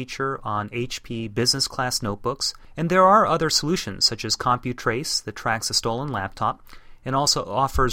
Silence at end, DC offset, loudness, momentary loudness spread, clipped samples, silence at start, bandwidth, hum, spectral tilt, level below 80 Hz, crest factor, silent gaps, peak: 0 s; under 0.1%; -22 LUFS; 11 LU; under 0.1%; 0 s; 16.5 kHz; none; -3.5 dB/octave; -42 dBFS; 18 dB; none; -4 dBFS